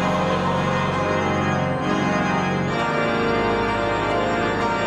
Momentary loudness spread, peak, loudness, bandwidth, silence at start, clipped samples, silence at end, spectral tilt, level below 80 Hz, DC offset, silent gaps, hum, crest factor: 1 LU; -10 dBFS; -21 LUFS; 11.5 kHz; 0 s; under 0.1%; 0 s; -6 dB/octave; -42 dBFS; under 0.1%; none; none; 12 dB